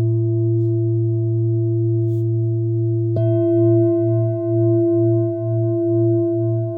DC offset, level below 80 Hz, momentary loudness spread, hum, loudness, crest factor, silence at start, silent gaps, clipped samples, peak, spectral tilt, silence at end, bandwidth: under 0.1%; -62 dBFS; 4 LU; none; -18 LUFS; 10 dB; 0 s; none; under 0.1%; -6 dBFS; -14 dB/octave; 0 s; 1.6 kHz